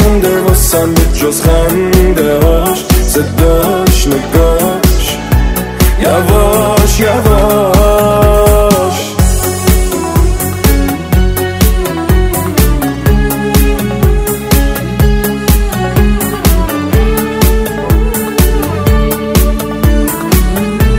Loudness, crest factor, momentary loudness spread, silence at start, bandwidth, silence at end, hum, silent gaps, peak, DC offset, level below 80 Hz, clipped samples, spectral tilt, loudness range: -10 LUFS; 8 dB; 4 LU; 0 s; 16.5 kHz; 0 s; none; none; 0 dBFS; under 0.1%; -12 dBFS; 0.6%; -5.5 dB/octave; 3 LU